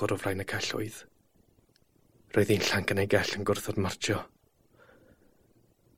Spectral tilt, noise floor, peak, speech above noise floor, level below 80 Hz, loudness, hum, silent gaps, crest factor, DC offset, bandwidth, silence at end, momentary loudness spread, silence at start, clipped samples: -4.5 dB/octave; -66 dBFS; -10 dBFS; 37 dB; -60 dBFS; -29 LUFS; none; none; 22 dB; under 0.1%; 16.5 kHz; 0.85 s; 10 LU; 0 s; under 0.1%